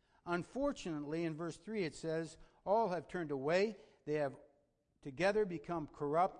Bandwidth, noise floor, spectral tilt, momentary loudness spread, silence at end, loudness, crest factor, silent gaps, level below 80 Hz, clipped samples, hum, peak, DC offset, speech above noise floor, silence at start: 10 kHz; -77 dBFS; -6 dB/octave; 10 LU; 0 s; -39 LUFS; 18 dB; none; -66 dBFS; under 0.1%; none; -20 dBFS; under 0.1%; 40 dB; 0.25 s